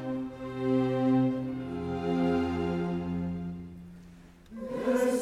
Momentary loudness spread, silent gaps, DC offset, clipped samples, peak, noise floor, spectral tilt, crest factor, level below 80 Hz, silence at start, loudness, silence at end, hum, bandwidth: 18 LU; none; under 0.1%; under 0.1%; -16 dBFS; -52 dBFS; -7.5 dB/octave; 14 dB; -54 dBFS; 0 s; -30 LUFS; 0 s; none; 13 kHz